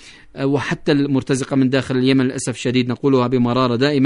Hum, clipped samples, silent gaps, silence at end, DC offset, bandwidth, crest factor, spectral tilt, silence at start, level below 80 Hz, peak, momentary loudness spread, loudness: none; under 0.1%; none; 0 s; under 0.1%; 11 kHz; 14 dB; -6 dB/octave; 0.05 s; -50 dBFS; -4 dBFS; 5 LU; -18 LUFS